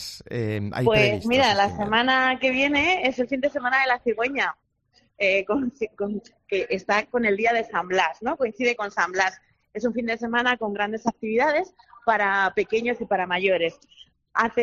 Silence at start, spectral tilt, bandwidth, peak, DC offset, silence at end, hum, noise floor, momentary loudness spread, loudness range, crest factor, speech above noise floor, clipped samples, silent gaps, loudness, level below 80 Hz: 0 s; -4.5 dB/octave; 12.5 kHz; -4 dBFS; under 0.1%; 0 s; none; -64 dBFS; 9 LU; 4 LU; 18 dB; 41 dB; under 0.1%; none; -23 LUFS; -56 dBFS